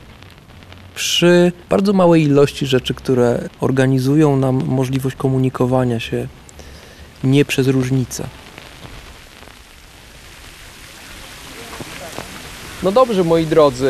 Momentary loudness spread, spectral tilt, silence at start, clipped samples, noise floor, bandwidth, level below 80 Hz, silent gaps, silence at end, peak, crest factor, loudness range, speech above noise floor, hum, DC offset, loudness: 24 LU; -6 dB/octave; 0.1 s; under 0.1%; -41 dBFS; 14 kHz; -44 dBFS; none; 0 s; -2 dBFS; 16 dB; 19 LU; 27 dB; none; under 0.1%; -16 LUFS